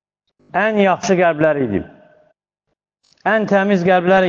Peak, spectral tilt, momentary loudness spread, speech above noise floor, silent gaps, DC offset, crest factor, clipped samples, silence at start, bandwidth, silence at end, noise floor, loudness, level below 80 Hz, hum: -2 dBFS; -6 dB/octave; 10 LU; 61 dB; none; under 0.1%; 16 dB; under 0.1%; 0.55 s; 7.4 kHz; 0 s; -75 dBFS; -16 LUFS; -54 dBFS; none